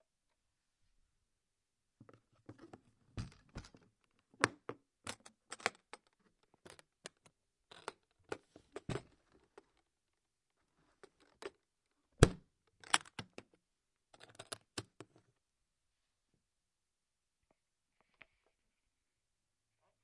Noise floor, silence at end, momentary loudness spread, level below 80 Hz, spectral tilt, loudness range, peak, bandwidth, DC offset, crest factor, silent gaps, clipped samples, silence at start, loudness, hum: under -90 dBFS; 5.2 s; 25 LU; -58 dBFS; -4 dB/octave; 18 LU; -6 dBFS; 11.5 kHz; under 0.1%; 40 dB; none; under 0.1%; 2.5 s; -40 LUFS; none